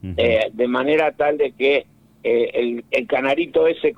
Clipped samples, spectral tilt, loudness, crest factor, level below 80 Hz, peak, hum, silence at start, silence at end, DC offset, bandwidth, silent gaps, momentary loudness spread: under 0.1%; -6.5 dB/octave; -19 LUFS; 12 dB; -50 dBFS; -6 dBFS; none; 0.05 s; 0.05 s; under 0.1%; 7.8 kHz; none; 4 LU